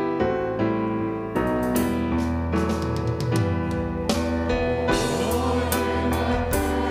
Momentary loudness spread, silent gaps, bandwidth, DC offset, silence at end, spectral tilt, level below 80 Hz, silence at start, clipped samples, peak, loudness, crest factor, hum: 3 LU; none; 16 kHz; under 0.1%; 0 s; -6 dB/octave; -34 dBFS; 0 s; under 0.1%; -6 dBFS; -24 LUFS; 16 dB; none